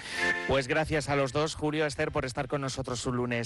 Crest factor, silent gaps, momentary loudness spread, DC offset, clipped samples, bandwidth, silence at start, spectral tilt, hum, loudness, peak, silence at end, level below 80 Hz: 12 dB; none; 5 LU; under 0.1%; under 0.1%; 12 kHz; 0 s; -4.5 dB/octave; none; -30 LUFS; -18 dBFS; 0 s; -50 dBFS